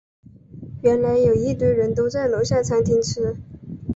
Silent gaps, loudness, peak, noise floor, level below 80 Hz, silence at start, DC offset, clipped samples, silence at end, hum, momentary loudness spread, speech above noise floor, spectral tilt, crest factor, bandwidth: none; -20 LUFS; -6 dBFS; -40 dBFS; -42 dBFS; 0.55 s; under 0.1%; under 0.1%; 0 s; none; 17 LU; 21 dB; -6.5 dB/octave; 14 dB; 8 kHz